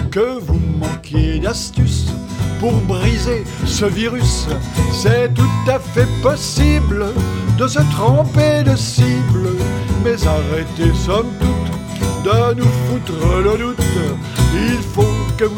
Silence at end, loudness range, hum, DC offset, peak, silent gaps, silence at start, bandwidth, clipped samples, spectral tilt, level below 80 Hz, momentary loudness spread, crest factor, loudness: 0 s; 3 LU; none; under 0.1%; 0 dBFS; none; 0 s; 17 kHz; under 0.1%; -6 dB/octave; -24 dBFS; 6 LU; 14 dB; -16 LUFS